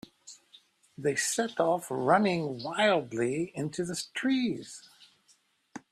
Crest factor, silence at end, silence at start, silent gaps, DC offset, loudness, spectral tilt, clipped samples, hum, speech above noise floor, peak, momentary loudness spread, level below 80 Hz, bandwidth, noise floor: 20 dB; 0.15 s; 0.25 s; none; under 0.1%; -29 LUFS; -4 dB/octave; under 0.1%; none; 38 dB; -12 dBFS; 23 LU; -72 dBFS; 14 kHz; -67 dBFS